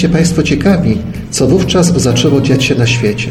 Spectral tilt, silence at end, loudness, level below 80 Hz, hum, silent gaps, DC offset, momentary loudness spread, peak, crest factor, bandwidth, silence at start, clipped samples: -5.5 dB/octave; 0 s; -11 LUFS; -30 dBFS; none; none; under 0.1%; 4 LU; 0 dBFS; 10 dB; 14 kHz; 0 s; under 0.1%